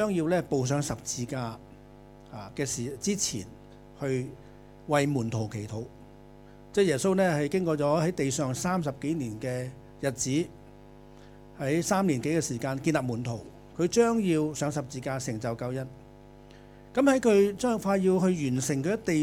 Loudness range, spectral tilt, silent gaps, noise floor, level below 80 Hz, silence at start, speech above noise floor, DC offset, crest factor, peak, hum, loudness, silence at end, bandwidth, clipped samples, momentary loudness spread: 6 LU; -5.5 dB/octave; none; -50 dBFS; -56 dBFS; 0 s; 23 dB; under 0.1%; 18 dB; -10 dBFS; 50 Hz at -50 dBFS; -28 LUFS; 0 s; 17 kHz; under 0.1%; 14 LU